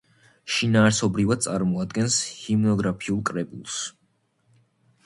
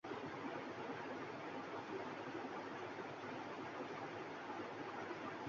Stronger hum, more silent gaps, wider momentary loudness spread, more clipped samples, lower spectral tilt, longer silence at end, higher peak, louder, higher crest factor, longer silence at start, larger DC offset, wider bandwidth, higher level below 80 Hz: neither; neither; first, 12 LU vs 1 LU; neither; about the same, -4.5 dB/octave vs -3.5 dB/octave; first, 1.15 s vs 0 s; first, -4 dBFS vs -34 dBFS; first, -24 LUFS vs -48 LUFS; first, 20 dB vs 14 dB; first, 0.45 s vs 0.05 s; neither; first, 11.5 kHz vs 7.4 kHz; first, -54 dBFS vs -82 dBFS